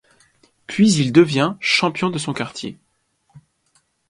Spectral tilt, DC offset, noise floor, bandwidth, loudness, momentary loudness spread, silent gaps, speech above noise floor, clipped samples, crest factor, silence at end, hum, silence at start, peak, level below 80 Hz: -5 dB/octave; under 0.1%; -65 dBFS; 11.5 kHz; -18 LUFS; 14 LU; none; 48 dB; under 0.1%; 20 dB; 0.7 s; none; 0.7 s; 0 dBFS; -60 dBFS